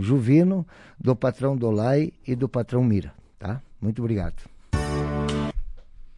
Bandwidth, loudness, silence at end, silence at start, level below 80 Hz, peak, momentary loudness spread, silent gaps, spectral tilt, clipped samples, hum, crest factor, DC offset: 11.5 kHz; -24 LUFS; 0.05 s; 0 s; -38 dBFS; -6 dBFS; 14 LU; none; -8.5 dB/octave; under 0.1%; none; 18 dB; under 0.1%